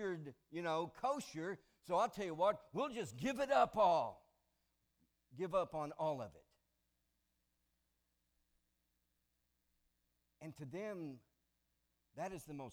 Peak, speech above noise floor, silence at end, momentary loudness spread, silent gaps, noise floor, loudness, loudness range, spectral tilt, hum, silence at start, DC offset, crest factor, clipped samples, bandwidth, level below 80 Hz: -22 dBFS; 45 dB; 0 s; 16 LU; none; -84 dBFS; -40 LUFS; 16 LU; -5.5 dB/octave; 60 Hz at -80 dBFS; 0 s; under 0.1%; 22 dB; under 0.1%; 18.5 kHz; -74 dBFS